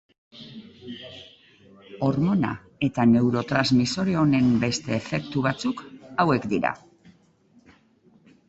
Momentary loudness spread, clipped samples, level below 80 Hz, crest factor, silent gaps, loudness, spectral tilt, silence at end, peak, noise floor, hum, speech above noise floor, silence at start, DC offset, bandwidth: 22 LU; under 0.1%; -56 dBFS; 20 dB; none; -23 LUFS; -6 dB/octave; 1.7 s; -6 dBFS; -59 dBFS; none; 36 dB; 0.35 s; under 0.1%; 8.2 kHz